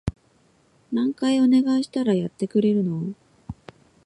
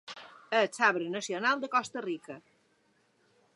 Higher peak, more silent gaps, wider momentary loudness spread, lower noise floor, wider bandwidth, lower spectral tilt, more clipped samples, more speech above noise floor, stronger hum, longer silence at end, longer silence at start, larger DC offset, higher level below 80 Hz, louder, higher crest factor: about the same, -10 dBFS vs -12 dBFS; neither; about the same, 22 LU vs 21 LU; second, -61 dBFS vs -70 dBFS; about the same, 11 kHz vs 11.5 kHz; first, -7 dB/octave vs -3 dB/octave; neither; about the same, 40 dB vs 40 dB; neither; second, 0.55 s vs 1.15 s; about the same, 0.05 s vs 0.05 s; neither; first, -48 dBFS vs -86 dBFS; first, -22 LUFS vs -30 LUFS; second, 14 dB vs 22 dB